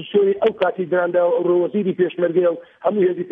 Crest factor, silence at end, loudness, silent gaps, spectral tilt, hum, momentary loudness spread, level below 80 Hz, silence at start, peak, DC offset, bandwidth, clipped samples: 12 dB; 0 s; -19 LUFS; none; -9.5 dB/octave; none; 4 LU; -68 dBFS; 0 s; -6 dBFS; under 0.1%; 3.8 kHz; under 0.1%